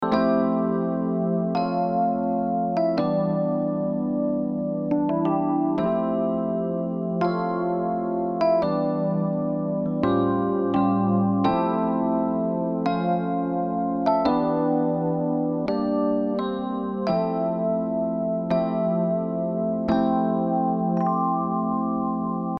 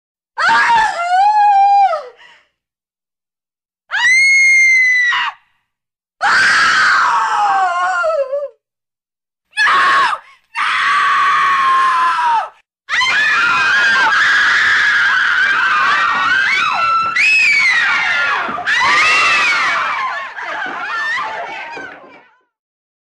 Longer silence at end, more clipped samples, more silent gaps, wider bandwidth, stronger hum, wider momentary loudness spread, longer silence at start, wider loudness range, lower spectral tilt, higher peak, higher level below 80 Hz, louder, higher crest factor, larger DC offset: second, 0 s vs 1 s; neither; neither; second, 6 kHz vs 13 kHz; neither; second, 4 LU vs 13 LU; second, 0 s vs 0.35 s; second, 2 LU vs 5 LU; first, -10 dB/octave vs 0 dB/octave; second, -8 dBFS vs -4 dBFS; about the same, -56 dBFS vs -56 dBFS; second, -24 LUFS vs -12 LUFS; first, 16 dB vs 10 dB; neither